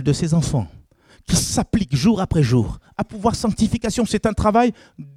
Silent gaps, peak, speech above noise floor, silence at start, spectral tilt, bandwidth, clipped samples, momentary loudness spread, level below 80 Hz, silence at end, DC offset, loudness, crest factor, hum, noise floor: none; -4 dBFS; 32 dB; 0 s; -5.5 dB/octave; 15.5 kHz; under 0.1%; 9 LU; -36 dBFS; 0.05 s; under 0.1%; -20 LUFS; 16 dB; none; -51 dBFS